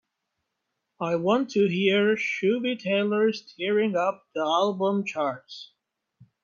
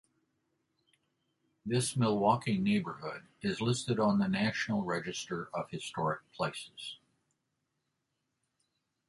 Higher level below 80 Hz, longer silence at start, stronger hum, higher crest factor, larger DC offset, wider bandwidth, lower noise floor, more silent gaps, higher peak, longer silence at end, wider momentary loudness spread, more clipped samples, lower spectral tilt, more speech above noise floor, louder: second, -76 dBFS vs -68 dBFS; second, 1 s vs 1.65 s; neither; about the same, 18 dB vs 20 dB; neither; second, 7.2 kHz vs 11.5 kHz; about the same, -81 dBFS vs -83 dBFS; neither; first, -8 dBFS vs -14 dBFS; second, 0.8 s vs 2.15 s; second, 8 LU vs 14 LU; neither; about the same, -6 dB/octave vs -5.5 dB/octave; first, 56 dB vs 51 dB; first, -25 LUFS vs -33 LUFS